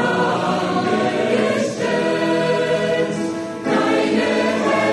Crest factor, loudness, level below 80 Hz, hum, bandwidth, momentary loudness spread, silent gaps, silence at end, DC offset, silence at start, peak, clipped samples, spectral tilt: 12 dB; -19 LUFS; -58 dBFS; none; 12 kHz; 3 LU; none; 0 s; under 0.1%; 0 s; -6 dBFS; under 0.1%; -5 dB/octave